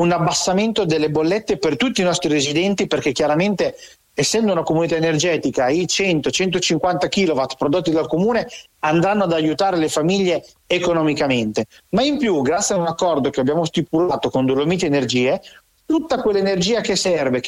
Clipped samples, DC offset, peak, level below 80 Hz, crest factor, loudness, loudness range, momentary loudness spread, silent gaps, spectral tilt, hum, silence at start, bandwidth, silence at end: under 0.1%; under 0.1%; -8 dBFS; -50 dBFS; 10 dB; -18 LUFS; 1 LU; 3 LU; none; -4.5 dB/octave; none; 0 s; 15 kHz; 0 s